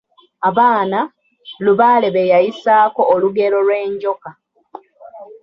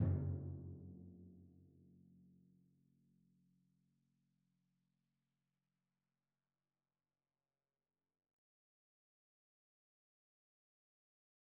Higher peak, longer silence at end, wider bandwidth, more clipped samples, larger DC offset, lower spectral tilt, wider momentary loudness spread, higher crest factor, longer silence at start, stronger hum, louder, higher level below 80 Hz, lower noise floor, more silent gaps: first, -2 dBFS vs -28 dBFS; second, 0.1 s vs 9.8 s; first, 6.2 kHz vs 1.8 kHz; neither; neither; second, -7.5 dB/octave vs -12 dB/octave; second, 9 LU vs 26 LU; second, 14 dB vs 26 dB; first, 0.4 s vs 0 s; neither; first, -14 LUFS vs -47 LUFS; first, -64 dBFS vs -72 dBFS; second, -39 dBFS vs under -90 dBFS; neither